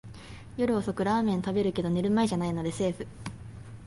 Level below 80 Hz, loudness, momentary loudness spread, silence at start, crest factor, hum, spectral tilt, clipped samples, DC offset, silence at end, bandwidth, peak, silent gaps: -52 dBFS; -28 LUFS; 18 LU; 0.05 s; 14 dB; none; -6.5 dB/octave; under 0.1%; under 0.1%; 0 s; 11.5 kHz; -14 dBFS; none